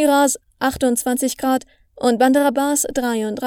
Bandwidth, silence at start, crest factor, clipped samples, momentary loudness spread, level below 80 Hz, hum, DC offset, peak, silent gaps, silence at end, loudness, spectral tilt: 18.5 kHz; 0 s; 16 dB; under 0.1%; 7 LU; -50 dBFS; none; under 0.1%; -2 dBFS; none; 0 s; -18 LUFS; -3 dB/octave